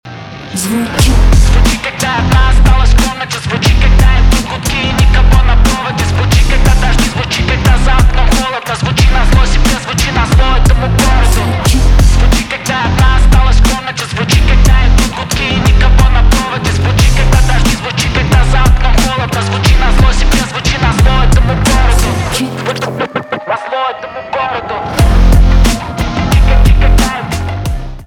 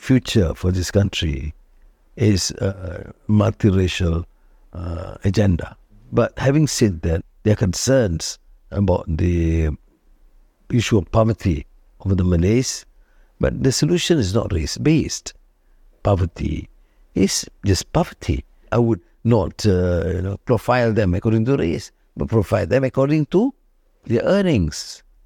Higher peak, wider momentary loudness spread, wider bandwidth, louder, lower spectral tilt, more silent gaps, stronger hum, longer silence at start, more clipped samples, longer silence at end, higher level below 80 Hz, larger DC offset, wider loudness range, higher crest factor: about the same, 0 dBFS vs -2 dBFS; second, 7 LU vs 12 LU; about the same, 15.5 kHz vs 16 kHz; first, -11 LUFS vs -20 LUFS; about the same, -5 dB/octave vs -6 dB/octave; neither; neither; about the same, 0.05 s vs 0 s; neither; second, 0 s vs 0.3 s; first, -10 dBFS vs -34 dBFS; neither; about the same, 2 LU vs 2 LU; second, 8 dB vs 16 dB